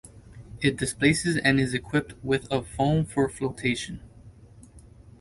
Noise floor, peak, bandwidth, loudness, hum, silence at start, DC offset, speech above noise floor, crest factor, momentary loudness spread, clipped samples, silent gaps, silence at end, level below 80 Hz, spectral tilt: -50 dBFS; -4 dBFS; 11.5 kHz; -26 LUFS; none; 0.05 s; under 0.1%; 24 dB; 22 dB; 8 LU; under 0.1%; none; 0.4 s; -48 dBFS; -5 dB/octave